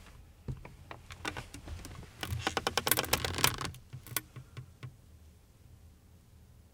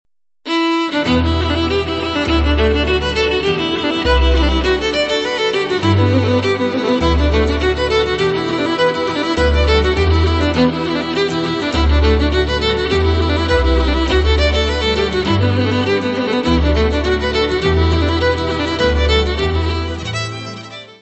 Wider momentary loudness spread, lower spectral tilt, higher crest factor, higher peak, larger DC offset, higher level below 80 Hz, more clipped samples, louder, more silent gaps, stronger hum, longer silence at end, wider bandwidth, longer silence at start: first, 22 LU vs 4 LU; second, -2.5 dB/octave vs -6 dB/octave; first, 36 dB vs 14 dB; about the same, -4 dBFS vs -2 dBFS; neither; second, -56 dBFS vs -20 dBFS; neither; second, -34 LUFS vs -15 LUFS; neither; neither; about the same, 0.15 s vs 0.1 s; first, 18 kHz vs 8.4 kHz; second, 0 s vs 0.45 s